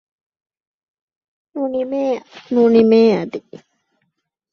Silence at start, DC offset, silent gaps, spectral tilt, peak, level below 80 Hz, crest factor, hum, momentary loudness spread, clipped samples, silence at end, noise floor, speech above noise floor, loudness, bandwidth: 1.55 s; under 0.1%; none; -7.5 dB/octave; -2 dBFS; -64 dBFS; 18 dB; none; 17 LU; under 0.1%; 1.15 s; -72 dBFS; 56 dB; -16 LUFS; 6.6 kHz